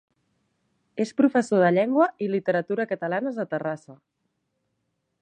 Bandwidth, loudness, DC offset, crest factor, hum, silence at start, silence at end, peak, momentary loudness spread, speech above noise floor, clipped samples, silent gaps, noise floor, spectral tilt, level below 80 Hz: 9.6 kHz; -24 LUFS; under 0.1%; 18 dB; none; 0.95 s; 1.25 s; -6 dBFS; 10 LU; 53 dB; under 0.1%; none; -76 dBFS; -7 dB/octave; -76 dBFS